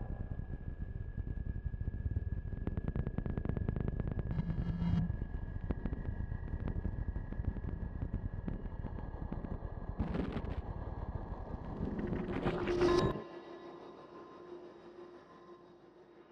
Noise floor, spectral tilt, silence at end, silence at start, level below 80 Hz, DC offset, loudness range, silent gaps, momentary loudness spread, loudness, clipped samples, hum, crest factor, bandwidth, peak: -59 dBFS; -8.5 dB/octave; 0 s; 0 s; -44 dBFS; under 0.1%; 5 LU; none; 17 LU; -40 LUFS; under 0.1%; none; 20 dB; 9.2 kHz; -18 dBFS